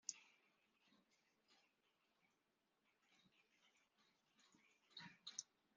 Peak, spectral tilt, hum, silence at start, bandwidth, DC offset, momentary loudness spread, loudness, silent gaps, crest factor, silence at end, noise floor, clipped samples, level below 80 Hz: -28 dBFS; -0.5 dB/octave; none; 0.05 s; 7.2 kHz; under 0.1%; 9 LU; -57 LUFS; none; 38 dB; 0.3 s; -88 dBFS; under 0.1%; under -90 dBFS